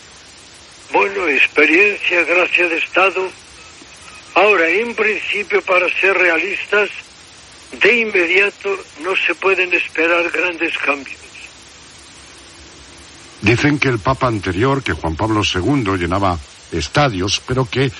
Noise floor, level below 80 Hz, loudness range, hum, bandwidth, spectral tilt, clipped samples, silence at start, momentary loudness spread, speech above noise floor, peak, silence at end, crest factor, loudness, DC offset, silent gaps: -41 dBFS; -42 dBFS; 6 LU; none; 11.5 kHz; -5 dB/octave; under 0.1%; 0.15 s; 12 LU; 25 dB; 0 dBFS; 0 s; 18 dB; -15 LUFS; under 0.1%; none